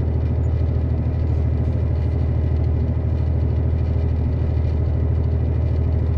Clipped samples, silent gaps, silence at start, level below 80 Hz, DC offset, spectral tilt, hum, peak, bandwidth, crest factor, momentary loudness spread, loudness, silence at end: under 0.1%; none; 0 s; -26 dBFS; under 0.1%; -11 dB/octave; none; -10 dBFS; 4.5 kHz; 10 dB; 1 LU; -21 LUFS; 0 s